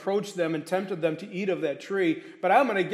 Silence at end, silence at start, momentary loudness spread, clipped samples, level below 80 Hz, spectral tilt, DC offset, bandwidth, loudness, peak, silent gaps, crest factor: 0 s; 0 s; 8 LU; under 0.1%; -82 dBFS; -6 dB/octave; under 0.1%; 14.5 kHz; -27 LUFS; -8 dBFS; none; 20 dB